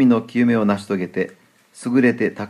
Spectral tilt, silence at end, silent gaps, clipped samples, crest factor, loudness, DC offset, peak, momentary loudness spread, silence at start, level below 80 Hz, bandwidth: -7 dB/octave; 0 s; none; under 0.1%; 16 dB; -19 LUFS; under 0.1%; -4 dBFS; 10 LU; 0 s; -66 dBFS; 11.5 kHz